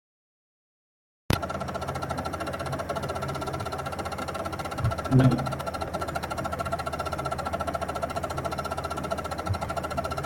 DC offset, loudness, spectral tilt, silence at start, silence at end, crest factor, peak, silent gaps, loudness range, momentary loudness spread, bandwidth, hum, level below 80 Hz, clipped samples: under 0.1%; -30 LUFS; -6 dB/octave; 1.3 s; 0 s; 26 dB; -4 dBFS; none; 4 LU; 7 LU; 16.5 kHz; none; -46 dBFS; under 0.1%